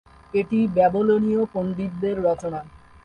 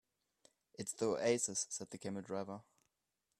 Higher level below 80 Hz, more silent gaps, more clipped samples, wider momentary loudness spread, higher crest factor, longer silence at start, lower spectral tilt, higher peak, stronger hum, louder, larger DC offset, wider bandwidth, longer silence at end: first, -52 dBFS vs -80 dBFS; neither; neither; second, 9 LU vs 14 LU; second, 16 dB vs 22 dB; second, 0.35 s vs 0.8 s; first, -8.5 dB/octave vs -3.5 dB/octave; first, -6 dBFS vs -20 dBFS; neither; first, -22 LUFS vs -40 LUFS; neither; second, 8.8 kHz vs 13.5 kHz; second, 0.3 s vs 0.8 s